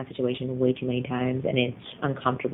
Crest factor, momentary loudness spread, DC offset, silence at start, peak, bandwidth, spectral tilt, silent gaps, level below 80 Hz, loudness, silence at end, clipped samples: 18 dB; 5 LU; under 0.1%; 0 s; -8 dBFS; 4 kHz; -10.5 dB/octave; none; -60 dBFS; -27 LUFS; 0 s; under 0.1%